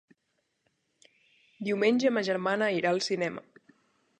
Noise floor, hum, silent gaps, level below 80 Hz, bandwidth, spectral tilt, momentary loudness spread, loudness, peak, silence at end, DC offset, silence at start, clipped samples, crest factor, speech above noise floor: -78 dBFS; none; none; -80 dBFS; 10 kHz; -4.5 dB/octave; 10 LU; -28 LUFS; -12 dBFS; 0.8 s; under 0.1%; 1.6 s; under 0.1%; 18 dB; 50 dB